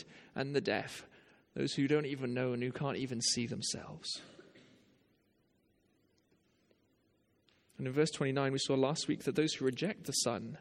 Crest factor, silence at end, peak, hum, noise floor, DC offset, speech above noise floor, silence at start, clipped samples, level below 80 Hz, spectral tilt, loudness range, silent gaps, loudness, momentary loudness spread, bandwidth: 20 dB; 0 s; -18 dBFS; none; -74 dBFS; under 0.1%; 39 dB; 0 s; under 0.1%; -74 dBFS; -4 dB/octave; 11 LU; none; -35 LUFS; 9 LU; 16 kHz